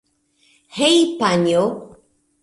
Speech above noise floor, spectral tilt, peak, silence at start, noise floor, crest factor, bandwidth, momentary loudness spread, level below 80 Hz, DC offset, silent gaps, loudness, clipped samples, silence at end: 44 dB; -4.5 dB/octave; -4 dBFS; 0.75 s; -60 dBFS; 16 dB; 11.5 kHz; 16 LU; -60 dBFS; under 0.1%; none; -17 LUFS; under 0.1%; 0.55 s